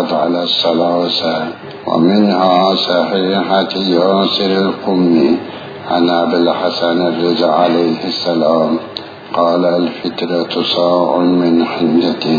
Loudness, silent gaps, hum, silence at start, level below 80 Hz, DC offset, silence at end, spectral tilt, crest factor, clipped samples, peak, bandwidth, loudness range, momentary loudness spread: -13 LUFS; none; none; 0 s; -60 dBFS; under 0.1%; 0 s; -7 dB/octave; 14 dB; under 0.1%; 0 dBFS; 5 kHz; 2 LU; 7 LU